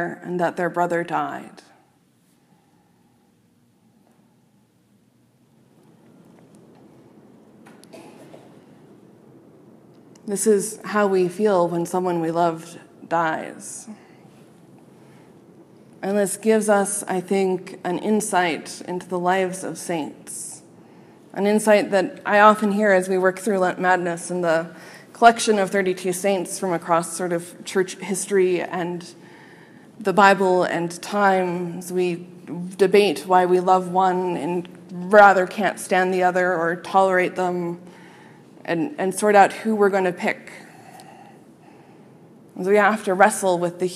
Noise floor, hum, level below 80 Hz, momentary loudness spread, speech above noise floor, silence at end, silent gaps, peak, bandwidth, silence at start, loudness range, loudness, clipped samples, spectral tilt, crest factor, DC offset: -60 dBFS; none; -72 dBFS; 16 LU; 40 dB; 0 s; none; 0 dBFS; 15 kHz; 0 s; 9 LU; -20 LUFS; under 0.1%; -4.5 dB/octave; 22 dB; under 0.1%